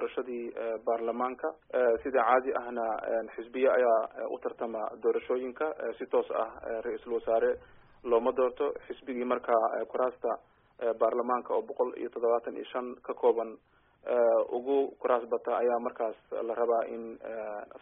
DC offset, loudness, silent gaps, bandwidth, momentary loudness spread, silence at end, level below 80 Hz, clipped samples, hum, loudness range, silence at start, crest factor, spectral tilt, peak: under 0.1%; -31 LUFS; none; 3.8 kHz; 11 LU; 0.05 s; -68 dBFS; under 0.1%; none; 3 LU; 0 s; 18 dB; 1.5 dB/octave; -12 dBFS